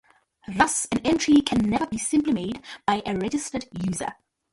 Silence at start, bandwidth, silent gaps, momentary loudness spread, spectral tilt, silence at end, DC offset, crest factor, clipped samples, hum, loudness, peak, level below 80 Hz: 0.5 s; 11.5 kHz; none; 12 LU; -4 dB/octave; 0.4 s; under 0.1%; 20 dB; under 0.1%; none; -24 LUFS; -4 dBFS; -50 dBFS